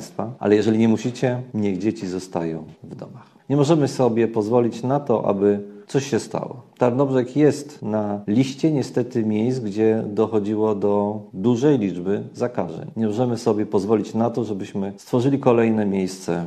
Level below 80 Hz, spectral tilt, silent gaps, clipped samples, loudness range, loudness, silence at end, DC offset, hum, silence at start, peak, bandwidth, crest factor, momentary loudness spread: -64 dBFS; -7 dB/octave; none; under 0.1%; 2 LU; -21 LUFS; 0 s; under 0.1%; none; 0 s; -4 dBFS; 12.5 kHz; 18 dB; 10 LU